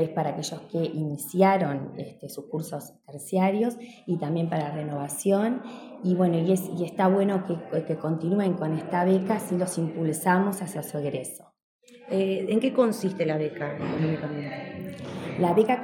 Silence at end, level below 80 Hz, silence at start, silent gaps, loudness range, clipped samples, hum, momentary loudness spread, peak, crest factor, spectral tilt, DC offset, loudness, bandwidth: 0 s; -72 dBFS; 0 s; 11.63-11.79 s; 2 LU; under 0.1%; none; 13 LU; -6 dBFS; 20 dB; -6.5 dB/octave; under 0.1%; -27 LUFS; 18 kHz